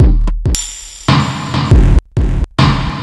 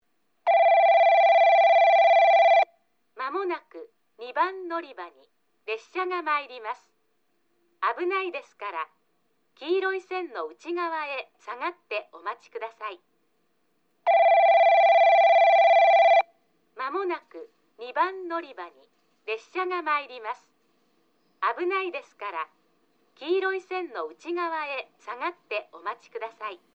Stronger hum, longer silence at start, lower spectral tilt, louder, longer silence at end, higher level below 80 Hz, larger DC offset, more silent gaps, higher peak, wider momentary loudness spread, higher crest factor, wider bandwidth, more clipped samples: neither; second, 0 s vs 0.45 s; first, -5.5 dB/octave vs -2 dB/octave; first, -14 LUFS vs -23 LUFS; second, 0 s vs 0.2 s; first, -14 dBFS vs under -90 dBFS; first, 0.2% vs under 0.1%; neither; first, 0 dBFS vs -10 dBFS; second, 7 LU vs 20 LU; about the same, 12 dB vs 14 dB; first, 12 kHz vs 6.4 kHz; first, 0.2% vs under 0.1%